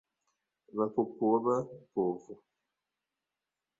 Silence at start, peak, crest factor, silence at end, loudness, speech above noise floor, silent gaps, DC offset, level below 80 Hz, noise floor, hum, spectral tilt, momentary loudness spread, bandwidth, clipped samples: 0.75 s; -16 dBFS; 20 dB; 1.45 s; -32 LUFS; 58 dB; none; under 0.1%; -78 dBFS; -90 dBFS; none; -10 dB/octave; 13 LU; 7.8 kHz; under 0.1%